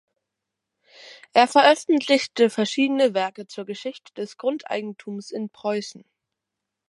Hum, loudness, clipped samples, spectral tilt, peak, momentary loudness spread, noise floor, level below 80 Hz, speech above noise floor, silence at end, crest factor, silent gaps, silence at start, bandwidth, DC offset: none; -22 LUFS; under 0.1%; -3.5 dB/octave; -2 dBFS; 18 LU; -84 dBFS; -80 dBFS; 62 dB; 0.9 s; 22 dB; none; 1 s; 11.5 kHz; under 0.1%